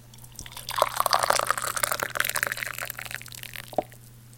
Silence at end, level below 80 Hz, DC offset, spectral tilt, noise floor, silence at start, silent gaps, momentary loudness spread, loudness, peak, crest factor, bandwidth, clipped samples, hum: 0 s; -56 dBFS; under 0.1%; -1 dB/octave; -48 dBFS; 0 s; none; 15 LU; -27 LUFS; 0 dBFS; 30 dB; 17 kHz; under 0.1%; none